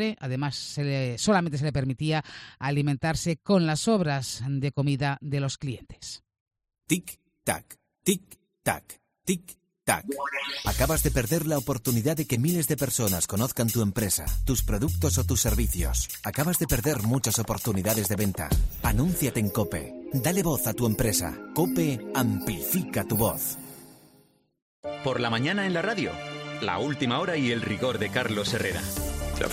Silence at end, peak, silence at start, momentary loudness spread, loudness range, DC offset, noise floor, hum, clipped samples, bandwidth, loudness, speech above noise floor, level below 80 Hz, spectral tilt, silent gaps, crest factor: 0 s; -10 dBFS; 0 s; 8 LU; 5 LU; under 0.1%; -62 dBFS; none; under 0.1%; 16 kHz; -27 LUFS; 35 dB; -38 dBFS; -4.5 dB/octave; 6.40-6.51 s, 24.62-24.83 s; 18 dB